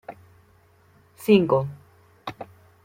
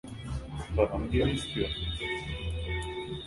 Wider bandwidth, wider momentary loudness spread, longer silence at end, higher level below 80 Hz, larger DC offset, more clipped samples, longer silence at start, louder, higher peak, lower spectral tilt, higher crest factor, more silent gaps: first, 16.5 kHz vs 11.5 kHz; first, 25 LU vs 10 LU; first, 0.4 s vs 0 s; second, -62 dBFS vs -38 dBFS; neither; neither; about the same, 0.1 s vs 0.05 s; first, -22 LUFS vs -32 LUFS; first, -4 dBFS vs -10 dBFS; about the same, -7 dB/octave vs -6 dB/octave; about the same, 22 dB vs 22 dB; neither